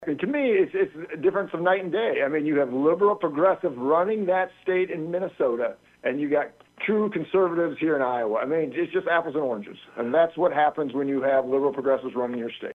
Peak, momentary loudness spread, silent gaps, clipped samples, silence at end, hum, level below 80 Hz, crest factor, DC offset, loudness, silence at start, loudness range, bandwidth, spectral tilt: -8 dBFS; 7 LU; none; under 0.1%; 0.05 s; none; -70 dBFS; 16 dB; under 0.1%; -25 LUFS; 0 s; 2 LU; 4.2 kHz; -8 dB/octave